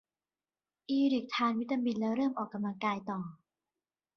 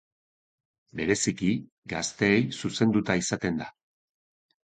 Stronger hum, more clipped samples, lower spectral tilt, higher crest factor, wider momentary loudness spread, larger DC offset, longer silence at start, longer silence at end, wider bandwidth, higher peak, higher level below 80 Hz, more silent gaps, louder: neither; neither; first, -6.5 dB/octave vs -4.5 dB/octave; second, 16 dB vs 22 dB; about the same, 10 LU vs 11 LU; neither; about the same, 0.9 s vs 0.95 s; second, 0.8 s vs 1.05 s; second, 6.6 kHz vs 9.4 kHz; second, -18 dBFS vs -8 dBFS; second, -78 dBFS vs -58 dBFS; second, none vs 1.72-1.82 s; second, -33 LUFS vs -27 LUFS